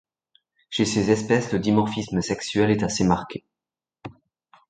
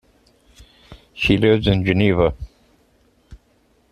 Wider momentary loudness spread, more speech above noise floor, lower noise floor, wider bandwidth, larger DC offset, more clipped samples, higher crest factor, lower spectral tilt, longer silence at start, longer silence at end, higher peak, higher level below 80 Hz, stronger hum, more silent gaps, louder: about the same, 21 LU vs 23 LU; first, 68 dB vs 43 dB; first, -90 dBFS vs -59 dBFS; second, 9.4 kHz vs 12.5 kHz; neither; neither; about the same, 20 dB vs 20 dB; second, -5.5 dB/octave vs -7.5 dB/octave; second, 0.7 s vs 0.9 s; about the same, 0.6 s vs 0.55 s; about the same, -4 dBFS vs -2 dBFS; second, -50 dBFS vs -38 dBFS; neither; neither; second, -23 LUFS vs -17 LUFS